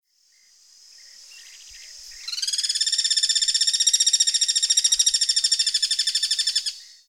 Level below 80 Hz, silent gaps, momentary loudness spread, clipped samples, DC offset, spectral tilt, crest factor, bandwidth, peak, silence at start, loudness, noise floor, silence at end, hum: -66 dBFS; none; 14 LU; under 0.1%; under 0.1%; 7.5 dB/octave; 20 dB; 17 kHz; -4 dBFS; 1.2 s; -19 LUFS; -60 dBFS; 0.25 s; none